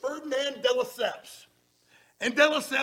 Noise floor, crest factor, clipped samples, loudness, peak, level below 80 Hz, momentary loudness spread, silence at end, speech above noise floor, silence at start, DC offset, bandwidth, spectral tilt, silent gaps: -64 dBFS; 20 dB; under 0.1%; -27 LUFS; -8 dBFS; -76 dBFS; 12 LU; 0 s; 37 dB; 0.05 s; under 0.1%; 17 kHz; -1.5 dB/octave; none